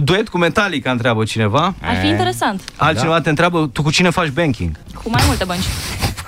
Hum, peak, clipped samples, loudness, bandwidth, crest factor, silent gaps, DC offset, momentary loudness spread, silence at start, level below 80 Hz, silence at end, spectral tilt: none; -2 dBFS; under 0.1%; -16 LUFS; 16 kHz; 14 dB; none; under 0.1%; 6 LU; 0 s; -32 dBFS; 0 s; -5 dB/octave